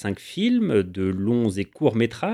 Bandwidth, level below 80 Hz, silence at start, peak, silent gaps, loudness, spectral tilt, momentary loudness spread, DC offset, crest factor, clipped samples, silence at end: 12 kHz; -58 dBFS; 0 s; -6 dBFS; none; -23 LUFS; -7 dB/octave; 5 LU; under 0.1%; 16 dB; under 0.1%; 0 s